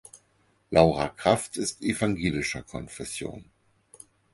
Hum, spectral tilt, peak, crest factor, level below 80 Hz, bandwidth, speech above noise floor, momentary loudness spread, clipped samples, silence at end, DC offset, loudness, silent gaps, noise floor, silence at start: none; -5 dB/octave; -2 dBFS; 26 dB; -50 dBFS; 12 kHz; 40 dB; 15 LU; under 0.1%; 0.9 s; under 0.1%; -26 LUFS; none; -67 dBFS; 0.15 s